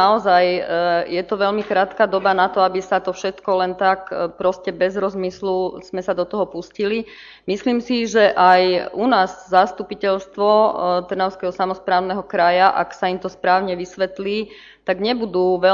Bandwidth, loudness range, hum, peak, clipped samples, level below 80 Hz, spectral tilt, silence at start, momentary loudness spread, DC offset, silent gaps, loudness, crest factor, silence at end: 7.4 kHz; 5 LU; none; 0 dBFS; under 0.1%; -56 dBFS; -5 dB/octave; 0 s; 10 LU; under 0.1%; none; -19 LUFS; 18 dB; 0 s